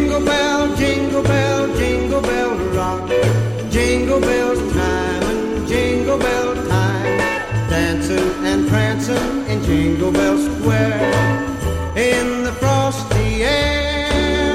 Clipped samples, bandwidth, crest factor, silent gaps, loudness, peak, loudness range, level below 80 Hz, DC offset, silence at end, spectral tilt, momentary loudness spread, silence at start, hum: under 0.1%; 15 kHz; 14 dB; none; -17 LUFS; -4 dBFS; 1 LU; -30 dBFS; under 0.1%; 0 s; -5.5 dB/octave; 4 LU; 0 s; none